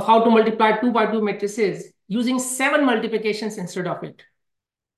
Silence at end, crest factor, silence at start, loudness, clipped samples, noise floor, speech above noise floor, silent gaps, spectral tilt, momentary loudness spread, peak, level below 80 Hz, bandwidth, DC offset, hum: 0.85 s; 16 dB; 0 s; -20 LUFS; under 0.1%; -82 dBFS; 62 dB; none; -4.5 dB/octave; 12 LU; -4 dBFS; -70 dBFS; 12.5 kHz; under 0.1%; none